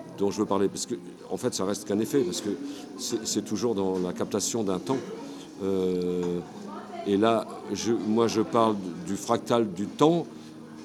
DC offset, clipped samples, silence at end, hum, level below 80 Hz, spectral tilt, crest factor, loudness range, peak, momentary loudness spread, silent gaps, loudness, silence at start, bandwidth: under 0.1%; under 0.1%; 0 s; none; -68 dBFS; -5 dB/octave; 22 dB; 3 LU; -6 dBFS; 13 LU; none; -28 LUFS; 0 s; 16.5 kHz